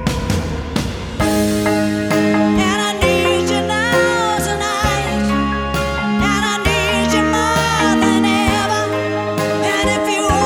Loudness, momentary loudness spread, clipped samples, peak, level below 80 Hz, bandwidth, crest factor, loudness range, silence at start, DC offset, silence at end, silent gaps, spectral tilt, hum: -16 LUFS; 5 LU; under 0.1%; 0 dBFS; -30 dBFS; 19 kHz; 14 dB; 1 LU; 0 s; under 0.1%; 0 s; none; -4.5 dB/octave; none